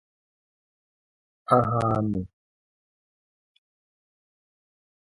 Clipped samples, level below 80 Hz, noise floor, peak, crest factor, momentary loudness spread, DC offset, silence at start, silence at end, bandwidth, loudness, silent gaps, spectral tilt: under 0.1%; -56 dBFS; under -90 dBFS; -4 dBFS; 26 dB; 20 LU; under 0.1%; 1.5 s; 2.85 s; 11.5 kHz; -24 LUFS; none; -9 dB/octave